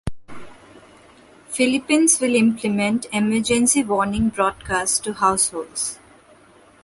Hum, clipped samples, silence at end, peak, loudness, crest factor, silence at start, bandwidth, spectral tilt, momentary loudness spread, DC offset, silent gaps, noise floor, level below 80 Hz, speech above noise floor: none; under 0.1%; 0.9 s; -2 dBFS; -19 LUFS; 18 dB; 0.05 s; 12 kHz; -3 dB/octave; 10 LU; under 0.1%; none; -51 dBFS; -46 dBFS; 31 dB